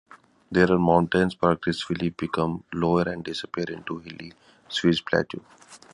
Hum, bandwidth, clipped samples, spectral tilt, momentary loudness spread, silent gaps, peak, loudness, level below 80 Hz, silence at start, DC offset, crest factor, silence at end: none; 11 kHz; under 0.1%; -6.5 dB/octave; 15 LU; none; -4 dBFS; -25 LUFS; -50 dBFS; 0.5 s; under 0.1%; 22 dB; 0.2 s